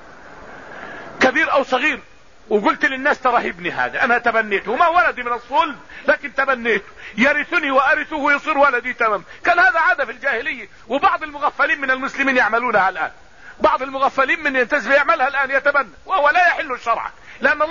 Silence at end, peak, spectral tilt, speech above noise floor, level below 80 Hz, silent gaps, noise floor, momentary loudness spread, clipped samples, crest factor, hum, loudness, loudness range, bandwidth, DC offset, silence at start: 0 s; -2 dBFS; -4 dB/octave; 22 dB; -52 dBFS; none; -40 dBFS; 9 LU; under 0.1%; 16 dB; none; -17 LUFS; 2 LU; 7.4 kHz; 0.5%; 0.25 s